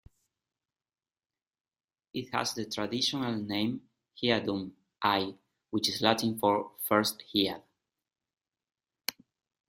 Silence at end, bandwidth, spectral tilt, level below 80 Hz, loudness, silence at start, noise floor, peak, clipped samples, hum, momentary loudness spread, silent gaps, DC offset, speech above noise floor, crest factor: 0.55 s; 16 kHz; -4 dB/octave; -70 dBFS; -31 LUFS; 2.15 s; under -90 dBFS; -8 dBFS; under 0.1%; none; 11 LU; none; under 0.1%; over 60 dB; 26 dB